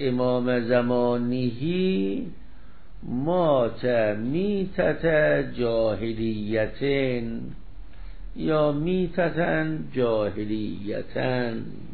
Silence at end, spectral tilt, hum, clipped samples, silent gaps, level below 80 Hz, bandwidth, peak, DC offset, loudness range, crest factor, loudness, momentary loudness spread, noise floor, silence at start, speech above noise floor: 0 s; -11.5 dB/octave; none; under 0.1%; none; -46 dBFS; 4.7 kHz; -8 dBFS; 2%; 3 LU; 16 dB; -25 LUFS; 10 LU; -48 dBFS; 0 s; 23 dB